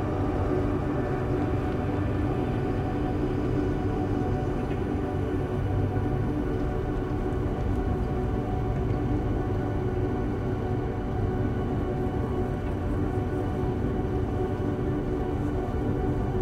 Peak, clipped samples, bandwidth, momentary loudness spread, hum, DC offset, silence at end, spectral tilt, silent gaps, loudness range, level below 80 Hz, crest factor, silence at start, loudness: -14 dBFS; under 0.1%; 10 kHz; 2 LU; none; under 0.1%; 0 s; -9 dB/octave; none; 1 LU; -34 dBFS; 12 dB; 0 s; -28 LUFS